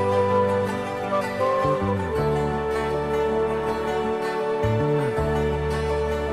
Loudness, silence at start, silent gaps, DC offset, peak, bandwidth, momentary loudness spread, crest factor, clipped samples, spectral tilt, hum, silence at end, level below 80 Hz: -24 LUFS; 0 s; none; under 0.1%; -10 dBFS; 14 kHz; 4 LU; 14 dB; under 0.1%; -7 dB/octave; none; 0 s; -38 dBFS